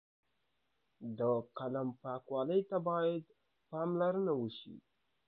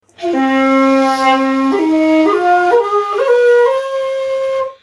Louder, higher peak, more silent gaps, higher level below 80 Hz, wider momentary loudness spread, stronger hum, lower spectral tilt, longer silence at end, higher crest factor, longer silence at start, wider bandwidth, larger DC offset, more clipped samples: second, -37 LUFS vs -12 LUFS; second, -22 dBFS vs -2 dBFS; neither; second, -84 dBFS vs -60 dBFS; first, 13 LU vs 7 LU; neither; first, -6.5 dB/octave vs -4 dB/octave; first, 0.5 s vs 0.1 s; first, 16 dB vs 10 dB; first, 1 s vs 0.2 s; second, 4.6 kHz vs 11 kHz; neither; neither